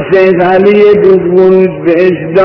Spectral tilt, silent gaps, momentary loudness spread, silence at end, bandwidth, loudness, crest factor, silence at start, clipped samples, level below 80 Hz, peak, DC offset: -9 dB/octave; none; 4 LU; 0 s; 5.4 kHz; -6 LUFS; 6 dB; 0 s; 8%; -42 dBFS; 0 dBFS; under 0.1%